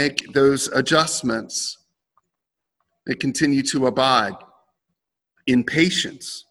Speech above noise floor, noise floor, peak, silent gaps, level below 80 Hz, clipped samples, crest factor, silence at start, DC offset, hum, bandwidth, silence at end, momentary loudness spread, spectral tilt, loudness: 63 dB; -83 dBFS; 0 dBFS; none; -58 dBFS; under 0.1%; 22 dB; 0 s; under 0.1%; none; 16.5 kHz; 0.1 s; 12 LU; -3.5 dB/octave; -20 LUFS